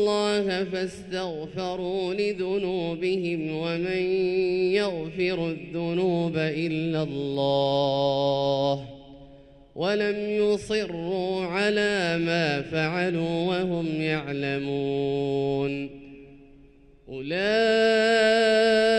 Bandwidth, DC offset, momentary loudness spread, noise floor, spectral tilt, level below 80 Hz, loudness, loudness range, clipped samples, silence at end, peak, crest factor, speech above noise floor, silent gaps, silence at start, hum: 11 kHz; under 0.1%; 11 LU; -53 dBFS; -5.5 dB/octave; -56 dBFS; -25 LUFS; 3 LU; under 0.1%; 0 s; -10 dBFS; 16 dB; 28 dB; none; 0 s; none